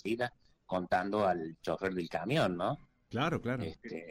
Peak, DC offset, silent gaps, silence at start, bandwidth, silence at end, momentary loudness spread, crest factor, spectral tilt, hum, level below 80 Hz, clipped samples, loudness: -20 dBFS; under 0.1%; none; 0.05 s; 16 kHz; 0 s; 9 LU; 14 dB; -6.5 dB/octave; none; -62 dBFS; under 0.1%; -35 LUFS